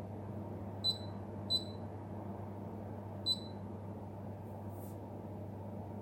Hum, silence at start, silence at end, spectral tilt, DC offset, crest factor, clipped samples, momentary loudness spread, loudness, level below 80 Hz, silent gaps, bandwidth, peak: none; 0 s; 0 s; -5.5 dB/octave; under 0.1%; 18 dB; under 0.1%; 11 LU; -41 LUFS; -64 dBFS; none; 16.5 kHz; -24 dBFS